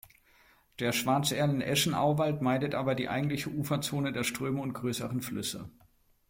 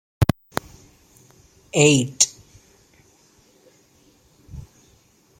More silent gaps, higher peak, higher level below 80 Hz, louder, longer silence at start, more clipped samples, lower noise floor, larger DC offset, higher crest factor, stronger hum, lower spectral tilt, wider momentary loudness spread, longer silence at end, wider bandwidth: neither; second, -16 dBFS vs 0 dBFS; second, -62 dBFS vs -46 dBFS; second, -31 LUFS vs -20 LUFS; first, 0.8 s vs 0.2 s; neither; first, -63 dBFS vs -57 dBFS; neither; second, 16 dB vs 24 dB; neither; about the same, -4.5 dB/octave vs -3.5 dB/octave; second, 7 LU vs 26 LU; second, 0.6 s vs 0.8 s; about the same, 16.5 kHz vs 16.5 kHz